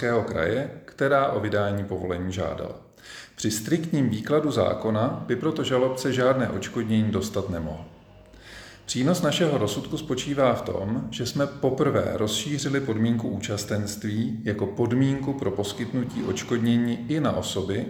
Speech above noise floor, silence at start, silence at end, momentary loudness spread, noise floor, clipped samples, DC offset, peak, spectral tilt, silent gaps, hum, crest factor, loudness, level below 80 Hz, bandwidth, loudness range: 24 dB; 0 s; 0 s; 8 LU; -49 dBFS; under 0.1%; under 0.1%; -8 dBFS; -5.5 dB/octave; none; none; 18 dB; -26 LUFS; -54 dBFS; 18 kHz; 3 LU